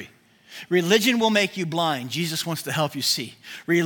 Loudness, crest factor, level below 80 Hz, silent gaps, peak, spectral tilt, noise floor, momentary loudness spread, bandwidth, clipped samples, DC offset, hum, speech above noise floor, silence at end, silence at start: -22 LUFS; 20 dB; -72 dBFS; none; -4 dBFS; -4 dB/octave; -50 dBFS; 15 LU; 18 kHz; under 0.1%; under 0.1%; none; 27 dB; 0 s; 0 s